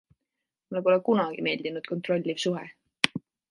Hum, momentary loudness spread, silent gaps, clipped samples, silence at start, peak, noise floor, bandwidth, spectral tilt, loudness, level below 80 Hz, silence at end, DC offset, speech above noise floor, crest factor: none; 12 LU; none; under 0.1%; 0.7 s; 0 dBFS; -85 dBFS; 11.5 kHz; -5 dB/octave; -28 LUFS; -74 dBFS; 0.3 s; under 0.1%; 58 dB; 28 dB